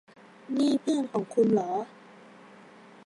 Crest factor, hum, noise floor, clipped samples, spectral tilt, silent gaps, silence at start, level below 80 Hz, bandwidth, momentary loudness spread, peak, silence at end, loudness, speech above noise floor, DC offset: 16 dB; none; -52 dBFS; under 0.1%; -6.5 dB/octave; none; 0.5 s; -82 dBFS; 11.5 kHz; 10 LU; -12 dBFS; 1.2 s; -27 LUFS; 25 dB; under 0.1%